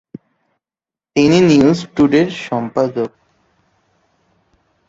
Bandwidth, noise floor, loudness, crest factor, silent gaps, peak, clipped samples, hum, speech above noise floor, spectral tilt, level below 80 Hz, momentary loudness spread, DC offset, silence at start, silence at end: 7.8 kHz; -90 dBFS; -14 LUFS; 16 dB; none; -2 dBFS; under 0.1%; none; 77 dB; -6.5 dB/octave; -52 dBFS; 12 LU; under 0.1%; 1.15 s; 1.8 s